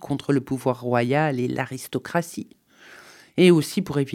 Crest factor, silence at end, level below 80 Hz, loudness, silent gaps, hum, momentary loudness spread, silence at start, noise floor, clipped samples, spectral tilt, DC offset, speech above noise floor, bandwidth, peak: 18 dB; 0 s; -62 dBFS; -23 LUFS; none; none; 15 LU; 0 s; -48 dBFS; under 0.1%; -6 dB/octave; under 0.1%; 26 dB; 16 kHz; -4 dBFS